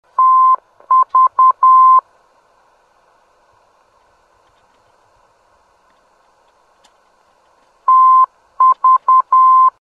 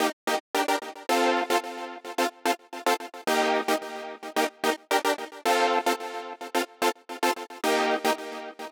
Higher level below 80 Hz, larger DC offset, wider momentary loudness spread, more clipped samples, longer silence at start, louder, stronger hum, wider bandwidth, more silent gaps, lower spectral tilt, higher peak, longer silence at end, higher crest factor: first, -72 dBFS vs -82 dBFS; neither; second, 6 LU vs 10 LU; neither; first, 0.2 s vs 0 s; first, -11 LUFS vs -27 LUFS; neither; second, 3.3 kHz vs 19.5 kHz; second, none vs 0.13-0.27 s, 0.40-0.54 s; first, -2.5 dB/octave vs -1 dB/octave; first, -4 dBFS vs -8 dBFS; about the same, 0.1 s vs 0 s; second, 12 dB vs 18 dB